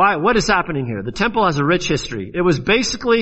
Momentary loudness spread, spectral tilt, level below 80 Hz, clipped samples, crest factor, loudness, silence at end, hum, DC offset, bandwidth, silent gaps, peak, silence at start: 8 LU; -4.5 dB/octave; -38 dBFS; under 0.1%; 16 dB; -18 LUFS; 0 s; none; under 0.1%; 8.2 kHz; none; -2 dBFS; 0 s